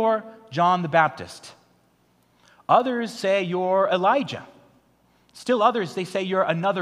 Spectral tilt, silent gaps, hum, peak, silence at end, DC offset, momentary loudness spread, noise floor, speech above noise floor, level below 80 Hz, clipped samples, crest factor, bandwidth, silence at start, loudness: -5.5 dB/octave; none; 60 Hz at -55 dBFS; -4 dBFS; 0 s; under 0.1%; 16 LU; -63 dBFS; 40 dB; -72 dBFS; under 0.1%; 20 dB; 13 kHz; 0 s; -22 LUFS